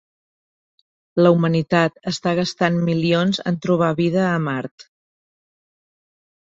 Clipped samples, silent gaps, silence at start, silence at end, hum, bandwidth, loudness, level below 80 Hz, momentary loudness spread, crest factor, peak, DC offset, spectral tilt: under 0.1%; 4.71-4.78 s; 1.15 s; 1.7 s; none; 7.8 kHz; -19 LUFS; -58 dBFS; 8 LU; 18 dB; -2 dBFS; under 0.1%; -6.5 dB/octave